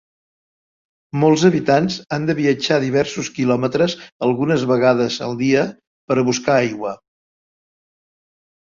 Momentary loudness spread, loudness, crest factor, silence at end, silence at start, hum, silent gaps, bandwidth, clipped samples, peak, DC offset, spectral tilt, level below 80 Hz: 8 LU; -18 LUFS; 18 dB; 1.7 s; 1.15 s; none; 4.12-4.20 s, 5.87-6.08 s; 7.6 kHz; under 0.1%; -2 dBFS; under 0.1%; -5.5 dB/octave; -58 dBFS